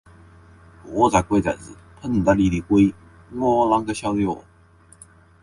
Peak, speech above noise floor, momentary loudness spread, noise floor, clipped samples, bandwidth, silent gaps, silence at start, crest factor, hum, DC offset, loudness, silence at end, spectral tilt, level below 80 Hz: -2 dBFS; 32 dB; 14 LU; -52 dBFS; under 0.1%; 11.5 kHz; none; 0.85 s; 20 dB; none; under 0.1%; -20 LUFS; 1 s; -6.5 dB/octave; -42 dBFS